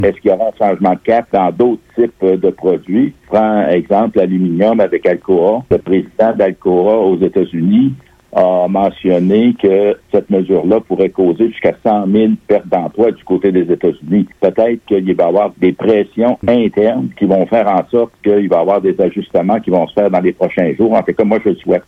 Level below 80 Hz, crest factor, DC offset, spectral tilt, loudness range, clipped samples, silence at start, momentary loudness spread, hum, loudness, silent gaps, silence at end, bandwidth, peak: -48 dBFS; 12 dB; under 0.1%; -9.5 dB/octave; 1 LU; under 0.1%; 0 s; 3 LU; none; -13 LUFS; none; 0.05 s; 5.8 kHz; 0 dBFS